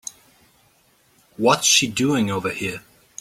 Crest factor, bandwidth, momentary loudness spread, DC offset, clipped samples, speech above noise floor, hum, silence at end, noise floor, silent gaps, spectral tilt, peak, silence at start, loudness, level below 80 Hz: 20 dB; 16.5 kHz; 22 LU; under 0.1%; under 0.1%; 40 dB; none; 0.4 s; -59 dBFS; none; -2.5 dB/octave; -2 dBFS; 1.4 s; -19 LUFS; -60 dBFS